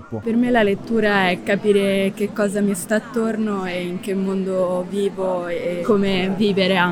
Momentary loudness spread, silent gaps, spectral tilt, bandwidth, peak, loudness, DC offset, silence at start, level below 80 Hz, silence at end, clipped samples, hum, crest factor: 6 LU; none; -5.5 dB/octave; 18.5 kHz; -4 dBFS; -20 LUFS; under 0.1%; 0 s; -48 dBFS; 0 s; under 0.1%; none; 16 dB